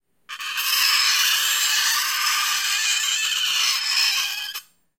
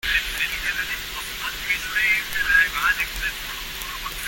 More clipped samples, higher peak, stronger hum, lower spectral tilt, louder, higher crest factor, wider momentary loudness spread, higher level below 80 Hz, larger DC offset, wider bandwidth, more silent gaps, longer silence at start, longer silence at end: neither; about the same, -6 dBFS vs -6 dBFS; neither; second, 5.5 dB/octave vs 0 dB/octave; first, -19 LUFS vs -22 LUFS; about the same, 16 dB vs 18 dB; about the same, 12 LU vs 12 LU; second, -78 dBFS vs -40 dBFS; neither; about the same, 16.5 kHz vs 17 kHz; neither; first, 0.3 s vs 0.05 s; first, 0.4 s vs 0 s